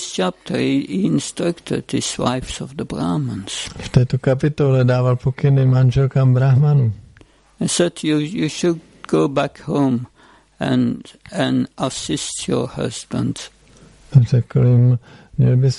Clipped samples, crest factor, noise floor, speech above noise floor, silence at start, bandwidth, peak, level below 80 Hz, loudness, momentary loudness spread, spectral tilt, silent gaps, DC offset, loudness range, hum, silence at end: under 0.1%; 16 dB; -49 dBFS; 32 dB; 0 s; 11.5 kHz; -2 dBFS; -44 dBFS; -18 LUFS; 11 LU; -6.5 dB/octave; none; under 0.1%; 6 LU; none; 0 s